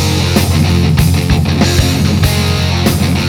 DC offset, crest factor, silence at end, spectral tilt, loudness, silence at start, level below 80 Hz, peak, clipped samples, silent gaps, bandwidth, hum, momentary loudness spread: under 0.1%; 10 dB; 0 s; -5 dB/octave; -11 LUFS; 0 s; -22 dBFS; 0 dBFS; under 0.1%; none; 18.5 kHz; none; 2 LU